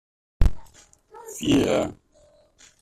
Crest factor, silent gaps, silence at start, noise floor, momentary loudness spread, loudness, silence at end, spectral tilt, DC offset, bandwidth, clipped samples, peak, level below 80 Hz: 20 dB; none; 0.4 s; -58 dBFS; 17 LU; -24 LUFS; 0.9 s; -5.5 dB/octave; under 0.1%; 14 kHz; under 0.1%; -4 dBFS; -30 dBFS